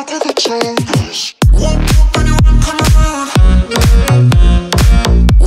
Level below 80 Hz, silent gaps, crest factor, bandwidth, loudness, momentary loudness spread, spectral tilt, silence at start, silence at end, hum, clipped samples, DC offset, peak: -10 dBFS; none; 8 dB; 15 kHz; -11 LUFS; 6 LU; -5.5 dB/octave; 0 s; 0 s; none; under 0.1%; under 0.1%; 0 dBFS